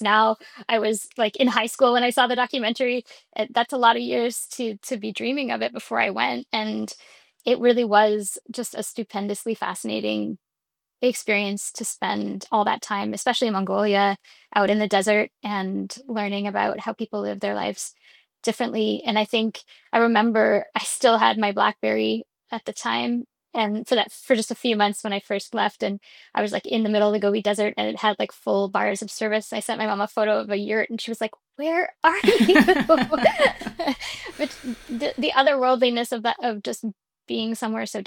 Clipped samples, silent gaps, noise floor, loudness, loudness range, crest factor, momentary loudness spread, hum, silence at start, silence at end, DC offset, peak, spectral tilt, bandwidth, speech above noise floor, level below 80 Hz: under 0.1%; none; -86 dBFS; -23 LUFS; 6 LU; 20 dB; 12 LU; none; 0 s; 0 s; under 0.1%; -4 dBFS; -3.5 dB/octave; 18 kHz; 63 dB; -62 dBFS